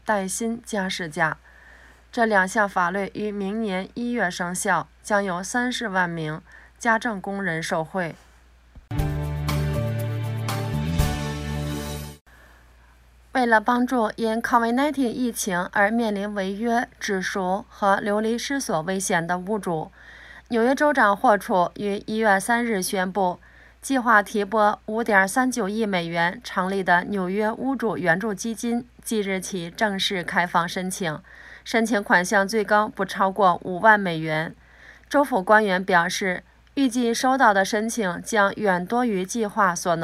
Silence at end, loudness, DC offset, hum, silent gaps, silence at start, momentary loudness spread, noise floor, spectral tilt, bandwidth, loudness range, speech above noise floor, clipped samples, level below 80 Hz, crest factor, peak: 0 s; -23 LUFS; under 0.1%; none; 12.21-12.25 s; 0.05 s; 10 LU; -53 dBFS; -4.5 dB/octave; 16 kHz; 6 LU; 30 dB; under 0.1%; -44 dBFS; 20 dB; -2 dBFS